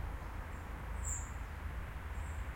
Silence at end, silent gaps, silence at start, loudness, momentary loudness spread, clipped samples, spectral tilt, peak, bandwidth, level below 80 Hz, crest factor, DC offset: 0 s; none; 0 s; -44 LUFS; 6 LU; under 0.1%; -4.5 dB/octave; -28 dBFS; 16.5 kHz; -44 dBFS; 16 dB; under 0.1%